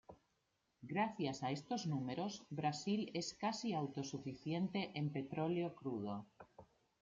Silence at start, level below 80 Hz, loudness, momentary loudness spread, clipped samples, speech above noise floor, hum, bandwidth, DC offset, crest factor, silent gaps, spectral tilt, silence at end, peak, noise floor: 0.1 s; -80 dBFS; -42 LUFS; 7 LU; under 0.1%; 42 dB; none; 7.8 kHz; under 0.1%; 18 dB; none; -5.5 dB/octave; 0.4 s; -26 dBFS; -83 dBFS